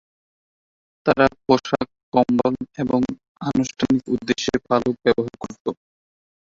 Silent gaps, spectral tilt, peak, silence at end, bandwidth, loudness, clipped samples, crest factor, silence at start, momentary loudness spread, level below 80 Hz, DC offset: 2.03-2.12 s, 3.28-3.35 s, 5.60-5.65 s; -5.5 dB/octave; -2 dBFS; 0.75 s; 7.6 kHz; -22 LUFS; under 0.1%; 20 dB; 1.05 s; 12 LU; -52 dBFS; under 0.1%